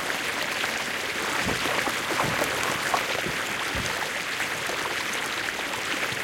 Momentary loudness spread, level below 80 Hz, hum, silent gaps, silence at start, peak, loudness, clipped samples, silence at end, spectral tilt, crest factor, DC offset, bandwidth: 3 LU; -52 dBFS; none; none; 0 s; -10 dBFS; -26 LUFS; under 0.1%; 0 s; -2 dB/octave; 18 dB; under 0.1%; 17 kHz